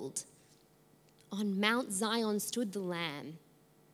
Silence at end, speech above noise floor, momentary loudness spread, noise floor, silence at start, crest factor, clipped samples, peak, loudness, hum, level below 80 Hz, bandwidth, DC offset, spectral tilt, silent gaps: 0.55 s; 31 dB; 17 LU; -65 dBFS; 0 s; 24 dB; under 0.1%; -14 dBFS; -35 LUFS; none; -84 dBFS; 16 kHz; under 0.1%; -3.5 dB/octave; none